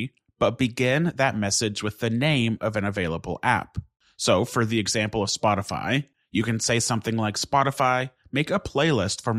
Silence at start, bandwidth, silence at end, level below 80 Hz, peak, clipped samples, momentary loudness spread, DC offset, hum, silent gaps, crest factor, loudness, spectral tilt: 0 s; 15 kHz; 0 s; -52 dBFS; -6 dBFS; under 0.1%; 6 LU; under 0.1%; none; none; 18 dB; -24 LUFS; -4.5 dB/octave